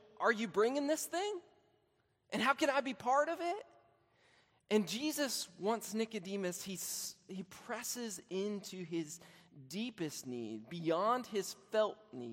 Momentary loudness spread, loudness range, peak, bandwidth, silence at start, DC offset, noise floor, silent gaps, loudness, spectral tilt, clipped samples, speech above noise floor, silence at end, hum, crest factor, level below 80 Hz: 11 LU; 6 LU; -16 dBFS; 16 kHz; 0.15 s; under 0.1%; -77 dBFS; none; -37 LUFS; -3.5 dB/octave; under 0.1%; 40 dB; 0 s; none; 22 dB; -84 dBFS